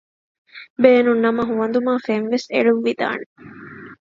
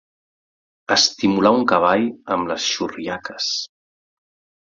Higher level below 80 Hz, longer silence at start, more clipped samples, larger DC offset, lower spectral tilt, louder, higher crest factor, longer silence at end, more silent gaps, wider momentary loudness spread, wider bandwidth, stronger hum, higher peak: second, -64 dBFS vs -58 dBFS; second, 0.55 s vs 0.9 s; neither; neither; first, -6 dB/octave vs -3 dB/octave; about the same, -18 LUFS vs -19 LUFS; about the same, 20 dB vs 20 dB; second, 0.2 s vs 1 s; first, 0.70-0.76 s, 3.26-3.36 s vs none; first, 24 LU vs 12 LU; about the same, 7.4 kHz vs 7.6 kHz; neither; about the same, 0 dBFS vs -2 dBFS